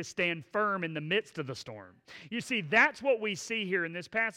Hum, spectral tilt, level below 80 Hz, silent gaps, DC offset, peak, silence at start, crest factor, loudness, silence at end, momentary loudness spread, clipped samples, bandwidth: none; -4 dB/octave; -74 dBFS; none; under 0.1%; -12 dBFS; 0 s; 20 dB; -30 LUFS; 0 s; 18 LU; under 0.1%; 15.5 kHz